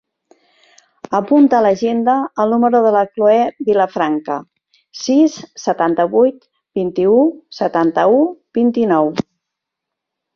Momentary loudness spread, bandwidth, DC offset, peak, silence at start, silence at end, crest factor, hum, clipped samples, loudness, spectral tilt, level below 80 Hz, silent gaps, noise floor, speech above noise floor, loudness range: 10 LU; 7 kHz; under 0.1%; -2 dBFS; 1.1 s; 1.15 s; 14 dB; none; under 0.1%; -15 LUFS; -6 dB/octave; -60 dBFS; none; -80 dBFS; 66 dB; 3 LU